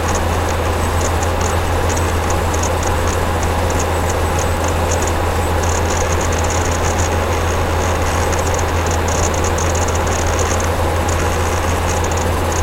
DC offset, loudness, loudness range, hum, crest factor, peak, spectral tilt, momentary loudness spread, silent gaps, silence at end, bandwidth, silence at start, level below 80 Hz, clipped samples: under 0.1%; -17 LUFS; 0 LU; none; 14 dB; -2 dBFS; -4.5 dB/octave; 1 LU; none; 0 s; 16.5 kHz; 0 s; -24 dBFS; under 0.1%